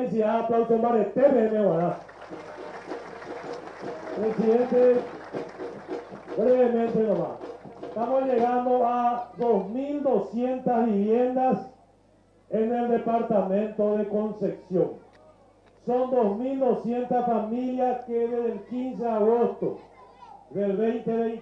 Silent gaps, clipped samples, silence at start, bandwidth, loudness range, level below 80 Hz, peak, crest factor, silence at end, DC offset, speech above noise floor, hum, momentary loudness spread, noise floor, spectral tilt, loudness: none; under 0.1%; 0 s; 7 kHz; 3 LU; -64 dBFS; -8 dBFS; 18 dB; 0 s; under 0.1%; 35 dB; none; 16 LU; -59 dBFS; -9 dB/octave; -25 LUFS